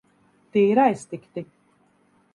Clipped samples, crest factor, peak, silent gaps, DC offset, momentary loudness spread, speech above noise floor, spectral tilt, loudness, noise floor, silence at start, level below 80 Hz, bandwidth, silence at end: under 0.1%; 20 dB; -6 dBFS; none; under 0.1%; 19 LU; 41 dB; -7 dB/octave; -21 LUFS; -62 dBFS; 0.55 s; -72 dBFS; 11.5 kHz; 0.9 s